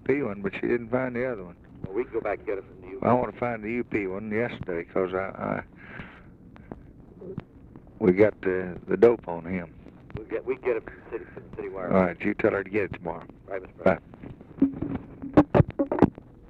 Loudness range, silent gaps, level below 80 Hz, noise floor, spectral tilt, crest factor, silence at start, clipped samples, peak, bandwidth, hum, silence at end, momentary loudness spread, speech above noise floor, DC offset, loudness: 6 LU; none; -50 dBFS; -49 dBFS; -9.5 dB/octave; 20 dB; 0.05 s; under 0.1%; -8 dBFS; 6.2 kHz; none; 0 s; 20 LU; 21 dB; under 0.1%; -27 LUFS